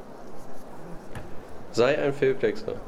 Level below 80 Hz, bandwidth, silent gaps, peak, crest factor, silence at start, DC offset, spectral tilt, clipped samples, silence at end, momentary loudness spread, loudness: -48 dBFS; 13.5 kHz; none; -10 dBFS; 18 dB; 0 s; under 0.1%; -5.5 dB/octave; under 0.1%; 0 s; 21 LU; -25 LUFS